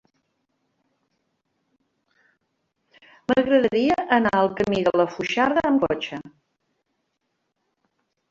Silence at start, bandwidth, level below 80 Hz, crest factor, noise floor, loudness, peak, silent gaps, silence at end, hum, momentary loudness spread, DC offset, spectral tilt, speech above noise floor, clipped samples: 3.3 s; 7.6 kHz; -58 dBFS; 20 dB; -76 dBFS; -21 LUFS; -4 dBFS; none; 2 s; none; 9 LU; under 0.1%; -6 dB/octave; 55 dB; under 0.1%